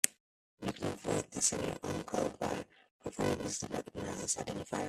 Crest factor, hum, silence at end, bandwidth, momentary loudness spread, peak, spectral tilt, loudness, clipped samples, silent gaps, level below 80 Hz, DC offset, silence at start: 34 dB; none; 0 s; 15.5 kHz; 11 LU; -4 dBFS; -3.5 dB/octave; -37 LUFS; under 0.1%; 0.20-0.57 s, 2.91-2.99 s; -62 dBFS; under 0.1%; 0.05 s